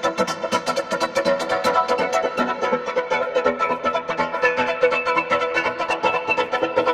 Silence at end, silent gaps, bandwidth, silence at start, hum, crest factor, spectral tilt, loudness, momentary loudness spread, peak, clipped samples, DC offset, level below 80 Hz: 0 s; none; 14.5 kHz; 0 s; none; 16 dB; -3.5 dB/octave; -21 LUFS; 4 LU; -6 dBFS; under 0.1%; under 0.1%; -58 dBFS